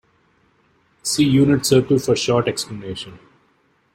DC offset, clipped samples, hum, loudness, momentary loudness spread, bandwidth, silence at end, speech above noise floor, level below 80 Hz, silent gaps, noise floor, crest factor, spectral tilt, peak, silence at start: under 0.1%; under 0.1%; none; -18 LUFS; 16 LU; 16.5 kHz; 0.75 s; 44 dB; -52 dBFS; none; -61 dBFS; 18 dB; -5 dB/octave; -2 dBFS; 1.05 s